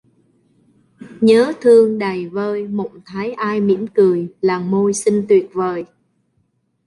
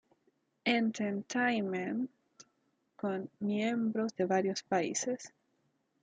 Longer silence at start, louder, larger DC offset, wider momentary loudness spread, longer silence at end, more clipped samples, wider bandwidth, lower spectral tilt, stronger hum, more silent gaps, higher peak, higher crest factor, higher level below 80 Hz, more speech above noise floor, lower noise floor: first, 1 s vs 0.65 s; first, -16 LUFS vs -34 LUFS; neither; first, 13 LU vs 7 LU; first, 1 s vs 0.75 s; neither; first, 11.5 kHz vs 9.4 kHz; first, -6 dB/octave vs -4.5 dB/octave; neither; neither; first, -2 dBFS vs -18 dBFS; about the same, 16 dB vs 18 dB; first, -62 dBFS vs -82 dBFS; first, 49 dB vs 44 dB; second, -65 dBFS vs -77 dBFS